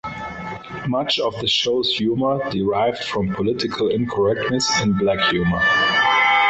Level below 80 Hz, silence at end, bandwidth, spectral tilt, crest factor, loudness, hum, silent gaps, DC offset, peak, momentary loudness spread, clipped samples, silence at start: -46 dBFS; 0 s; 8.2 kHz; -4 dB/octave; 14 dB; -19 LUFS; none; none; under 0.1%; -6 dBFS; 9 LU; under 0.1%; 0.05 s